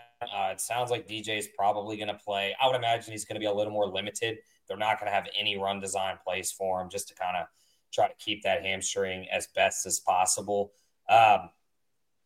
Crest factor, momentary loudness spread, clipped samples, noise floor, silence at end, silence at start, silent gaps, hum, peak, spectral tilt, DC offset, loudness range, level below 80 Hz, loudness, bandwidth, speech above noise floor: 22 dB; 9 LU; under 0.1%; -83 dBFS; 0.75 s; 0 s; none; none; -8 dBFS; -2 dB/octave; under 0.1%; 5 LU; -72 dBFS; -29 LUFS; 16.5 kHz; 54 dB